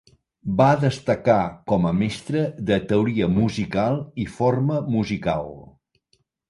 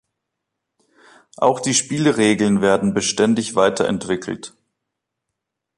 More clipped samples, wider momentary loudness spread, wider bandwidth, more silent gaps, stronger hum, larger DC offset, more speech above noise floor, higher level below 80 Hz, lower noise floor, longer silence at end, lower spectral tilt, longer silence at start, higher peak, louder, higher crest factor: neither; about the same, 8 LU vs 9 LU; about the same, 11.5 kHz vs 11.5 kHz; neither; neither; neither; second, 46 dB vs 62 dB; first, -48 dBFS vs -56 dBFS; second, -68 dBFS vs -80 dBFS; second, 0.85 s vs 1.3 s; first, -7.5 dB/octave vs -4 dB/octave; second, 0.45 s vs 1.4 s; about the same, -4 dBFS vs -2 dBFS; second, -22 LUFS vs -18 LUFS; about the same, 18 dB vs 18 dB